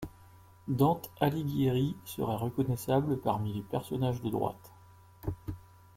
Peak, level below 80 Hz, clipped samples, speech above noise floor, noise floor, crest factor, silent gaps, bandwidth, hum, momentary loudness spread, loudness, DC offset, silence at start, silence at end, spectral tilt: -12 dBFS; -56 dBFS; under 0.1%; 26 dB; -57 dBFS; 20 dB; none; 16.5 kHz; none; 14 LU; -32 LUFS; under 0.1%; 0 s; 0.35 s; -7.5 dB/octave